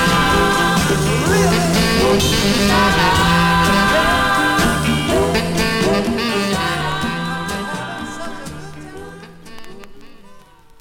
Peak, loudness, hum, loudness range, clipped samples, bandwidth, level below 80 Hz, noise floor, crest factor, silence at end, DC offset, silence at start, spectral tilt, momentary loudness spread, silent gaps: -4 dBFS; -15 LUFS; none; 13 LU; under 0.1%; 18.5 kHz; -32 dBFS; -42 dBFS; 12 dB; 0.4 s; under 0.1%; 0 s; -4 dB/octave; 15 LU; none